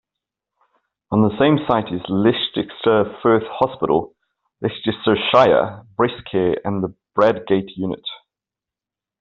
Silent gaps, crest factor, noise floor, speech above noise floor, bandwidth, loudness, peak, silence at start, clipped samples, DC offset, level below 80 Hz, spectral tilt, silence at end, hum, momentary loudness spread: none; 18 dB; -88 dBFS; 70 dB; 7 kHz; -19 LUFS; -2 dBFS; 1.1 s; under 0.1%; under 0.1%; -54 dBFS; -4.5 dB/octave; 1.05 s; none; 11 LU